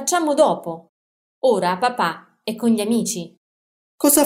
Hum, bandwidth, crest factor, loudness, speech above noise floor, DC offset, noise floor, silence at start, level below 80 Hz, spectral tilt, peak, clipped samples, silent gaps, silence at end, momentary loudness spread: none; 16 kHz; 18 dB; -20 LUFS; over 71 dB; under 0.1%; under -90 dBFS; 0 s; -64 dBFS; -3.5 dB/octave; -4 dBFS; under 0.1%; 0.89-1.42 s, 3.37-3.98 s; 0 s; 14 LU